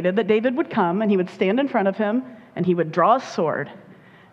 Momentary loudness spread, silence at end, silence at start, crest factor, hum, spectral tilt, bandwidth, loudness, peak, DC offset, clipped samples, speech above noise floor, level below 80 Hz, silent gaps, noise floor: 8 LU; 0.4 s; 0 s; 16 dB; none; -7.5 dB/octave; 7.8 kHz; -21 LUFS; -4 dBFS; under 0.1%; under 0.1%; 27 dB; -68 dBFS; none; -48 dBFS